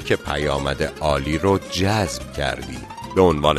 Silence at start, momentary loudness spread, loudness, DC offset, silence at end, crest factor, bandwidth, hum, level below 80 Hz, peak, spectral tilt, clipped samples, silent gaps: 0 s; 8 LU; -21 LUFS; under 0.1%; 0 s; 20 dB; 13.5 kHz; none; -36 dBFS; -2 dBFS; -5 dB/octave; under 0.1%; none